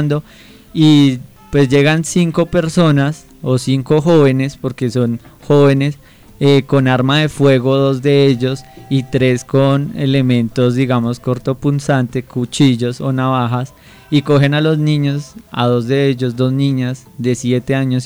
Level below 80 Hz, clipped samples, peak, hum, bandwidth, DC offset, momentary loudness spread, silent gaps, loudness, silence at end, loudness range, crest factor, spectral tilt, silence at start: -44 dBFS; under 0.1%; -2 dBFS; none; over 20 kHz; under 0.1%; 9 LU; none; -14 LUFS; 0 s; 2 LU; 12 dB; -6.5 dB/octave; 0 s